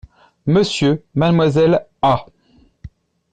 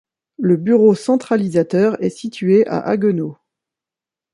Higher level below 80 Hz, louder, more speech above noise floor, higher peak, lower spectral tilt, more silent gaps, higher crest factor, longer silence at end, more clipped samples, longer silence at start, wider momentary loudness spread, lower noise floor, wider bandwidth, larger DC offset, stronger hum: first, -46 dBFS vs -62 dBFS; about the same, -16 LUFS vs -16 LUFS; second, 39 dB vs 73 dB; second, -6 dBFS vs -2 dBFS; about the same, -6.5 dB/octave vs -7.5 dB/octave; neither; about the same, 12 dB vs 14 dB; second, 0.45 s vs 1 s; neither; about the same, 0.45 s vs 0.4 s; second, 4 LU vs 10 LU; second, -54 dBFS vs -88 dBFS; second, 9.2 kHz vs 11.5 kHz; neither; neither